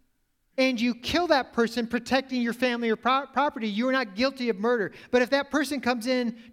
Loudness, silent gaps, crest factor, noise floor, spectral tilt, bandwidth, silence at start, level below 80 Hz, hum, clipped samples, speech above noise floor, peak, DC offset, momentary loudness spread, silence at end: -26 LUFS; none; 18 dB; -71 dBFS; -4 dB/octave; 15.5 kHz; 0.6 s; -60 dBFS; none; under 0.1%; 45 dB; -8 dBFS; under 0.1%; 4 LU; 0.1 s